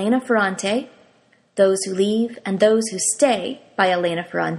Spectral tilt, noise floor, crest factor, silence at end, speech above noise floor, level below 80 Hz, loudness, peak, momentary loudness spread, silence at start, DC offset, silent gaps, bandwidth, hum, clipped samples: -3.5 dB/octave; -58 dBFS; 18 dB; 0 s; 38 dB; -66 dBFS; -20 LUFS; -2 dBFS; 7 LU; 0 s; under 0.1%; none; 14 kHz; none; under 0.1%